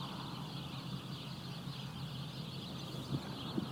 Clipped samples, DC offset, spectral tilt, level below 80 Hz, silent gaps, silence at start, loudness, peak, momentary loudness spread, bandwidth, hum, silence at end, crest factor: under 0.1%; under 0.1%; -5.5 dB/octave; -64 dBFS; none; 0 s; -44 LUFS; -22 dBFS; 3 LU; 19 kHz; none; 0 s; 20 dB